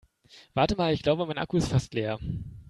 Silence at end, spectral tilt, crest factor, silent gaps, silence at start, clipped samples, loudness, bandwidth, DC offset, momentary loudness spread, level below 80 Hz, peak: 0.05 s; -6.5 dB/octave; 20 dB; none; 0.35 s; under 0.1%; -28 LUFS; 12 kHz; under 0.1%; 9 LU; -48 dBFS; -8 dBFS